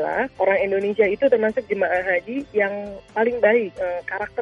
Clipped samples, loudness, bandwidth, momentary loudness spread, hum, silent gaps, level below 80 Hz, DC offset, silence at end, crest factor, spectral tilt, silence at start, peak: under 0.1%; -21 LUFS; 7.2 kHz; 9 LU; none; none; -56 dBFS; under 0.1%; 0 s; 16 dB; -7 dB/octave; 0 s; -4 dBFS